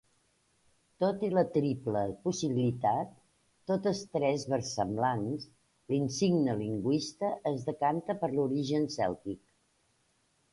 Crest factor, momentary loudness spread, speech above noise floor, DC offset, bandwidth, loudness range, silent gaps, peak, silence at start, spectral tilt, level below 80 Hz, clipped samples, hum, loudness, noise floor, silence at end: 18 dB; 6 LU; 42 dB; under 0.1%; 11.5 kHz; 2 LU; none; -14 dBFS; 1 s; -6 dB/octave; -66 dBFS; under 0.1%; none; -32 LUFS; -73 dBFS; 1.15 s